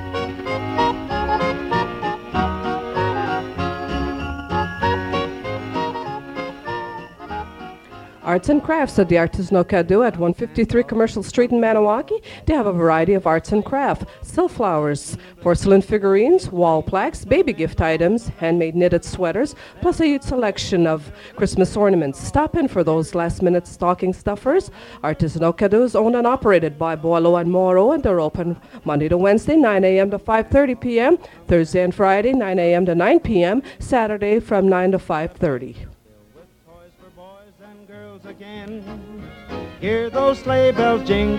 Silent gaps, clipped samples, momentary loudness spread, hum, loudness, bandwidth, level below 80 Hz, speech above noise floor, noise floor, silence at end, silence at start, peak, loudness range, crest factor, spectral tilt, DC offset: none; under 0.1%; 13 LU; none; -19 LUFS; 12 kHz; -40 dBFS; 32 dB; -49 dBFS; 0 s; 0 s; -2 dBFS; 8 LU; 16 dB; -6.5 dB/octave; under 0.1%